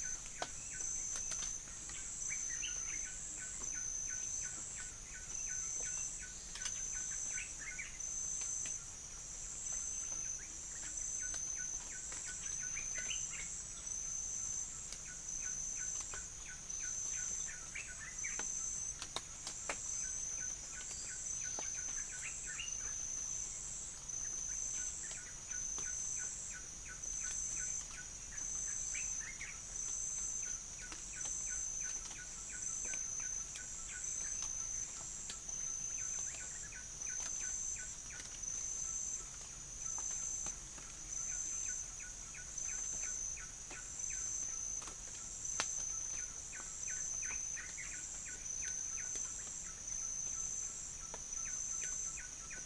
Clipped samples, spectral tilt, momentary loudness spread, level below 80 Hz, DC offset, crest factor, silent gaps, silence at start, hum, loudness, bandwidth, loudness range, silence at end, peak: under 0.1%; 0 dB/octave; 6 LU; -58 dBFS; under 0.1%; 26 dB; none; 0 s; none; -40 LUFS; 10.5 kHz; 1 LU; 0 s; -18 dBFS